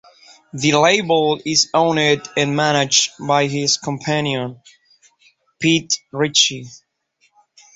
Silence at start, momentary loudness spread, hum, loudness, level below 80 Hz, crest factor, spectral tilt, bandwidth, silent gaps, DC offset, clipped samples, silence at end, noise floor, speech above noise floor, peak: 0.55 s; 8 LU; none; -17 LUFS; -58 dBFS; 18 dB; -3 dB/octave; 8 kHz; none; under 0.1%; under 0.1%; 1 s; -63 dBFS; 46 dB; 0 dBFS